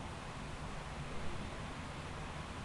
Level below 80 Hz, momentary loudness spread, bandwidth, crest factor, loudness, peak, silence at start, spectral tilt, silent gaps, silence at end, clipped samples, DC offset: -52 dBFS; 1 LU; 11.5 kHz; 16 dB; -45 LUFS; -28 dBFS; 0 s; -5 dB/octave; none; 0 s; under 0.1%; under 0.1%